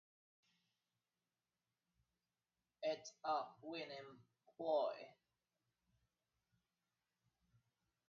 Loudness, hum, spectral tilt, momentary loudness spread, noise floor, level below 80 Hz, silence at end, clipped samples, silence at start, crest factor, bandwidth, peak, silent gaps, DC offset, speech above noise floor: -45 LUFS; none; -2 dB/octave; 16 LU; under -90 dBFS; under -90 dBFS; 2.95 s; under 0.1%; 2.8 s; 22 dB; 6.8 kHz; -28 dBFS; none; under 0.1%; over 45 dB